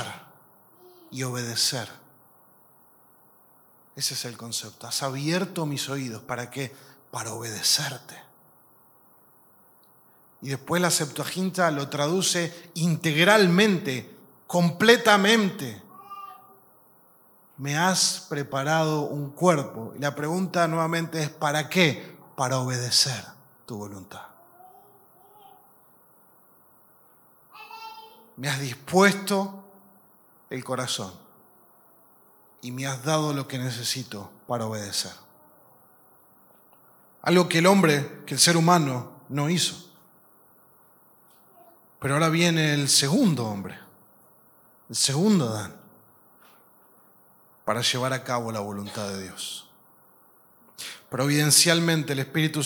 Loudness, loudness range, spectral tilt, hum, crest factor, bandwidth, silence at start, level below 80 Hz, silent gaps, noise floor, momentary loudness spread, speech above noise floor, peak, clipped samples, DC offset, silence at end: -24 LUFS; 10 LU; -3.5 dB/octave; none; 26 dB; 19 kHz; 0 s; -74 dBFS; none; -57 dBFS; 20 LU; 33 dB; 0 dBFS; under 0.1%; under 0.1%; 0 s